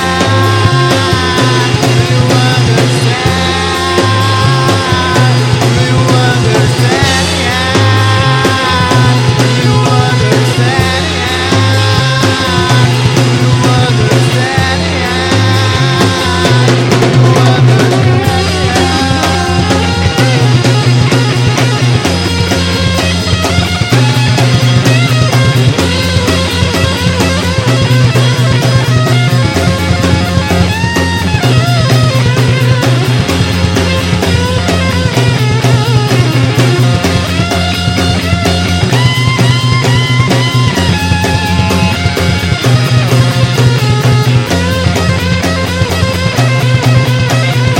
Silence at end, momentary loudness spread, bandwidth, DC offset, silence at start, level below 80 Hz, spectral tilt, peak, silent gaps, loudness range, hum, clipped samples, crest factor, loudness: 0 s; 3 LU; 16.5 kHz; under 0.1%; 0 s; -28 dBFS; -5 dB/octave; 0 dBFS; none; 1 LU; none; 1%; 8 dB; -9 LUFS